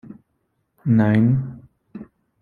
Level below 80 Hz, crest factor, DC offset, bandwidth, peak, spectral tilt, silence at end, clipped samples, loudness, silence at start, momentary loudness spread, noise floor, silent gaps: -54 dBFS; 18 dB; under 0.1%; 4.5 kHz; -4 dBFS; -10.5 dB/octave; 0.4 s; under 0.1%; -19 LUFS; 0.1 s; 24 LU; -71 dBFS; none